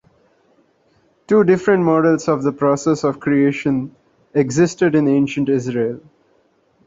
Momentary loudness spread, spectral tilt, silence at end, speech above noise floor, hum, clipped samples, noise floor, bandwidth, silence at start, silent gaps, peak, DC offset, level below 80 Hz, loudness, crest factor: 8 LU; -7 dB/octave; 0.9 s; 43 dB; none; under 0.1%; -59 dBFS; 8 kHz; 1.3 s; none; -2 dBFS; under 0.1%; -56 dBFS; -17 LUFS; 16 dB